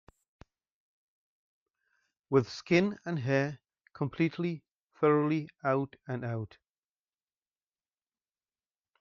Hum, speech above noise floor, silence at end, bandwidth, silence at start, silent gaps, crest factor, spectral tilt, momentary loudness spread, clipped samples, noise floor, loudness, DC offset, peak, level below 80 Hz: none; over 60 dB; 2.55 s; 7.4 kHz; 2.3 s; 4.71-4.90 s; 22 dB; -6 dB/octave; 11 LU; under 0.1%; under -90 dBFS; -31 LUFS; under 0.1%; -12 dBFS; -72 dBFS